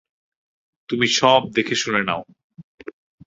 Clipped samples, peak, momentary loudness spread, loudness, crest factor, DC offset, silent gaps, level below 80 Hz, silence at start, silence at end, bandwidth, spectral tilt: under 0.1%; -2 dBFS; 25 LU; -19 LUFS; 22 dB; under 0.1%; 2.44-2.50 s, 2.64-2.78 s; -60 dBFS; 0.9 s; 0.35 s; 8 kHz; -3 dB/octave